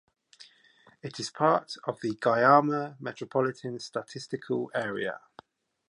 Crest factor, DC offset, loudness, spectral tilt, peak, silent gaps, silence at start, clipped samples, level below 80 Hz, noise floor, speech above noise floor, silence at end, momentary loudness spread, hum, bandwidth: 22 dB; under 0.1%; -28 LUFS; -5.5 dB/octave; -6 dBFS; none; 0.4 s; under 0.1%; -76 dBFS; -61 dBFS; 33 dB; 0.7 s; 17 LU; none; 11 kHz